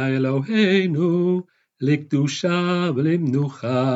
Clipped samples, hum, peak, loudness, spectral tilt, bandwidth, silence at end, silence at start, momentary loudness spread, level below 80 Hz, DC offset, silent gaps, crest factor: under 0.1%; none; -6 dBFS; -21 LUFS; -7 dB/octave; 8 kHz; 0 s; 0 s; 5 LU; -82 dBFS; under 0.1%; none; 14 dB